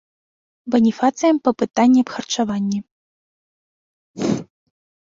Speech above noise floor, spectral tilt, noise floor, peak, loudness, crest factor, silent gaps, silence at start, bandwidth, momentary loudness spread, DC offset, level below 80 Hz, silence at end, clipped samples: over 73 dB; -5.5 dB/octave; under -90 dBFS; -2 dBFS; -19 LUFS; 18 dB; 2.91-4.14 s; 0.65 s; 7.6 kHz; 11 LU; under 0.1%; -62 dBFS; 0.6 s; under 0.1%